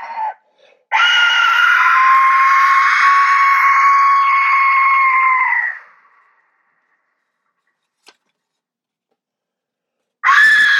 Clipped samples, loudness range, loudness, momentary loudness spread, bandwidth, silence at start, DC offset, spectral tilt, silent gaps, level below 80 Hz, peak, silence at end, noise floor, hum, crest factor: under 0.1%; 10 LU; -11 LUFS; 8 LU; 13 kHz; 0 s; under 0.1%; 3 dB/octave; none; -82 dBFS; 0 dBFS; 0 s; -84 dBFS; none; 14 dB